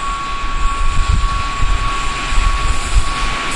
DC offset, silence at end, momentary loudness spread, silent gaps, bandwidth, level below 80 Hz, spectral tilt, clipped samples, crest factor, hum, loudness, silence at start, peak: under 0.1%; 0 s; 3 LU; none; 11.5 kHz; -16 dBFS; -3.5 dB/octave; under 0.1%; 14 dB; none; -19 LUFS; 0 s; 0 dBFS